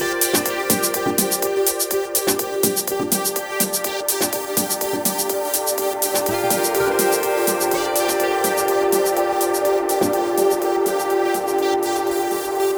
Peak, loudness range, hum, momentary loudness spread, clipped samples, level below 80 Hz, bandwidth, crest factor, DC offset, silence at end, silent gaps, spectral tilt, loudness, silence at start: -4 dBFS; 2 LU; none; 3 LU; under 0.1%; -56 dBFS; over 20 kHz; 16 dB; under 0.1%; 0 s; none; -2.5 dB/octave; -19 LUFS; 0 s